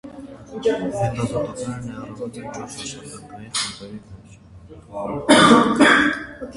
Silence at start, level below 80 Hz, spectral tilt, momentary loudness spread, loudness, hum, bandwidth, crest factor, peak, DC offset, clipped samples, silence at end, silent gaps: 0.05 s; -50 dBFS; -4 dB/octave; 24 LU; -18 LUFS; none; 11.5 kHz; 22 dB; 0 dBFS; under 0.1%; under 0.1%; 0 s; none